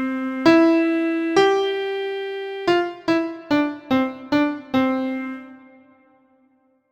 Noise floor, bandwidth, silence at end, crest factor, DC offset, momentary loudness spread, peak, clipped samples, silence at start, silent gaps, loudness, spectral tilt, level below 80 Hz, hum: -62 dBFS; 8.4 kHz; 1.35 s; 20 dB; under 0.1%; 11 LU; -2 dBFS; under 0.1%; 0 s; none; -21 LUFS; -5 dB/octave; -60 dBFS; none